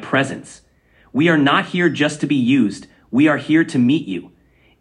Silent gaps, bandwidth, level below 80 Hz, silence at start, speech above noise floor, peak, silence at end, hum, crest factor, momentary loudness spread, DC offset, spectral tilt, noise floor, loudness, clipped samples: none; 10.5 kHz; -60 dBFS; 0 s; 38 dB; -2 dBFS; 0.55 s; none; 16 dB; 12 LU; under 0.1%; -6 dB/octave; -54 dBFS; -17 LUFS; under 0.1%